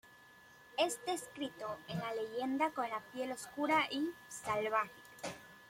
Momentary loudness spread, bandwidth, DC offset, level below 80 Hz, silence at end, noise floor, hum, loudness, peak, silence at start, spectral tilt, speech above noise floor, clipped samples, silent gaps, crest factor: 12 LU; 16.5 kHz; under 0.1%; -76 dBFS; 0 s; -61 dBFS; none; -38 LUFS; -20 dBFS; 0.05 s; -3.5 dB/octave; 23 dB; under 0.1%; none; 20 dB